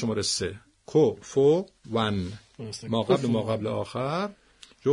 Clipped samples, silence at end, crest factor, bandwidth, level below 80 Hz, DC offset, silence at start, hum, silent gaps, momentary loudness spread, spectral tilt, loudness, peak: under 0.1%; 0 s; 18 dB; 11 kHz; -62 dBFS; under 0.1%; 0 s; none; none; 14 LU; -5.5 dB/octave; -26 LUFS; -10 dBFS